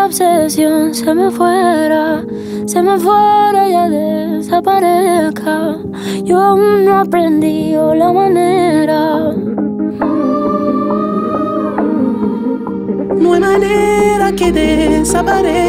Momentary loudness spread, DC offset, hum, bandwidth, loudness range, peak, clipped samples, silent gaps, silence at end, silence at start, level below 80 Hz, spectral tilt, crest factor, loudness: 7 LU; under 0.1%; none; 16 kHz; 4 LU; -2 dBFS; under 0.1%; none; 0 s; 0 s; -36 dBFS; -5.5 dB/octave; 10 dB; -12 LUFS